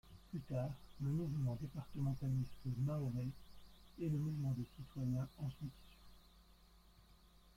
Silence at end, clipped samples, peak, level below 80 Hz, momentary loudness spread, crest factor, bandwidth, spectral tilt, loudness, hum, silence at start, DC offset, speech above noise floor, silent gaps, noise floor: 0.05 s; under 0.1%; -30 dBFS; -62 dBFS; 11 LU; 14 dB; 15.5 kHz; -8.5 dB/octave; -43 LUFS; none; 0.05 s; under 0.1%; 24 dB; none; -66 dBFS